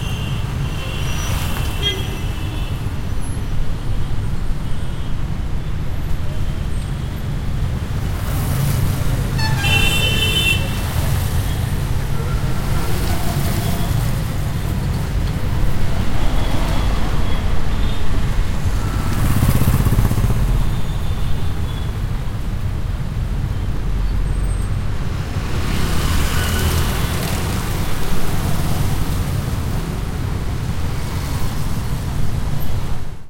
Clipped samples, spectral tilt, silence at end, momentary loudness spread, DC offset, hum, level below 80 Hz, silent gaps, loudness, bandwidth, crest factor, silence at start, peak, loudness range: under 0.1%; -5 dB/octave; 0 s; 8 LU; under 0.1%; none; -22 dBFS; none; -21 LUFS; 16.5 kHz; 16 dB; 0 s; 0 dBFS; 7 LU